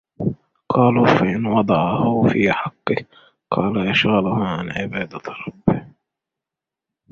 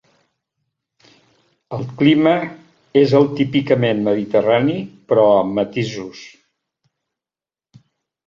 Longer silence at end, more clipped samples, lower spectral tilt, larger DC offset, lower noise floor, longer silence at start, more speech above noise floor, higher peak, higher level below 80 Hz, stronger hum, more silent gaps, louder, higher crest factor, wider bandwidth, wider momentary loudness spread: second, 1.25 s vs 2 s; neither; about the same, -7.5 dB/octave vs -7.5 dB/octave; neither; about the same, -87 dBFS vs under -90 dBFS; second, 0.2 s vs 1.7 s; second, 68 dB vs over 74 dB; about the same, -2 dBFS vs 0 dBFS; first, -50 dBFS vs -58 dBFS; neither; neither; about the same, -19 LUFS vs -17 LUFS; about the same, 18 dB vs 18 dB; about the same, 7 kHz vs 7.4 kHz; second, 11 LU vs 16 LU